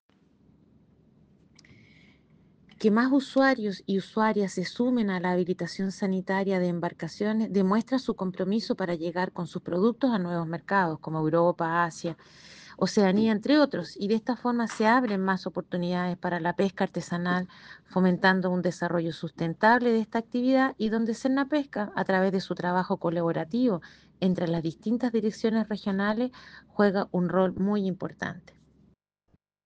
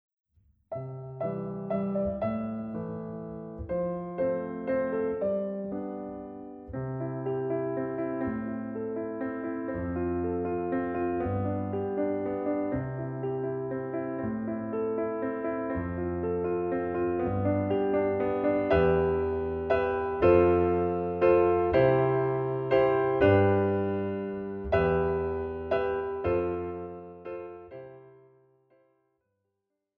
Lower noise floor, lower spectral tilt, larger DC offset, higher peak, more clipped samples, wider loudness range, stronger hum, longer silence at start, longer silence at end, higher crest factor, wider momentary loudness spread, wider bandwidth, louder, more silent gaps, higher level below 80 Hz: second, -70 dBFS vs -82 dBFS; about the same, -6.5 dB/octave vs -7.5 dB/octave; neither; about the same, -8 dBFS vs -10 dBFS; neither; second, 3 LU vs 9 LU; neither; first, 2.8 s vs 0.7 s; second, 1.25 s vs 1.85 s; about the same, 20 dB vs 18 dB; second, 9 LU vs 14 LU; first, 9 kHz vs 5 kHz; about the same, -27 LUFS vs -29 LUFS; neither; second, -64 dBFS vs -50 dBFS